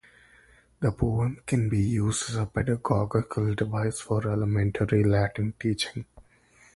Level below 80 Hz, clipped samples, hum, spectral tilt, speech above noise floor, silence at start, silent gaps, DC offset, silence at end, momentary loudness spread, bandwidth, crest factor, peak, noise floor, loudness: -46 dBFS; under 0.1%; none; -6 dB/octave; 33 dB; 0.8 s; none; under 0.1%; 0.55 s; 5 LU; 11.5 kHz; 20 dB; -8 dBFS; -59 dBFS; -27 LUFS